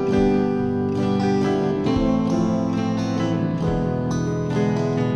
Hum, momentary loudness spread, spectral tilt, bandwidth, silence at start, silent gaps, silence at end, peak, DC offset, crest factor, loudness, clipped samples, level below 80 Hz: none; 3 LU; -7.5 dB/octave; 9.2 kHz; 0 s; none; 0 s; -8 dBFS; 0.2%; 12 dB; -21 LUFS; under 0.1%; -40 dBFS